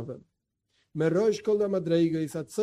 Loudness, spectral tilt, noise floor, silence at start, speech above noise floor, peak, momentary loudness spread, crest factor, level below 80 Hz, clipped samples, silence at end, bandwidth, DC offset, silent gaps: -27 LUFS; -7 dB/octave; -76 dBFS; 0 s; 50 dB; -14 dBFS; 16 LU; 14 dB; -68 dBFS; under 0.1%; 0 s; 14 kHz; under 0.1%; none